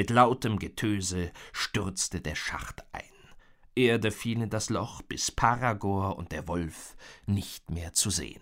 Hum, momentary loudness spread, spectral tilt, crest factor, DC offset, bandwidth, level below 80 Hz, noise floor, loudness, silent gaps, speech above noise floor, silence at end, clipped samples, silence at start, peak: none; 14 LU; -4 dB/octave; 22 dB; under 0.1%; 16 kHz; -48 dBFS; -54 dBFS; -30 LUFS; none; 25 dB; 0.05 s; under 0.1%; 0 s; -8 dBFS